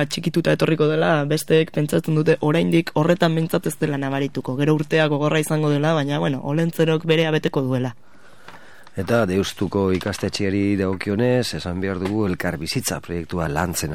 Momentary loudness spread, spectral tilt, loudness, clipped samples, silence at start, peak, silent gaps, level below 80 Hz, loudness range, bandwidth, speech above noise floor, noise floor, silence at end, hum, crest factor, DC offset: 6 LU; -6 dB/octave; -21 LUFS; under 0.1%; 0 s; -4 dBFS; none; -50 dBFS; 4 LU; 17.5 kHz; 25 dB; -46 dBFS; 0 s; none; 16 dB; 0.9%